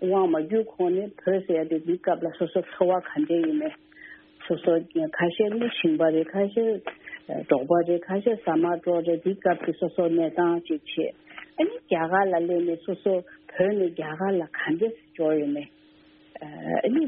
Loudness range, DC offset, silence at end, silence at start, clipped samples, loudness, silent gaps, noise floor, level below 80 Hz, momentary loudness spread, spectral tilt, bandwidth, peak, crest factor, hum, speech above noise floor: 2 LU; under 0.1%; 0 s; 0 s; under 0.1%; -26 LUFS; none; -55 dBFS; -70 dBFS; 11 LU; -5 dB/octave; 3.9 kHz; -6 dBFS; 20 dB; none; 31 dB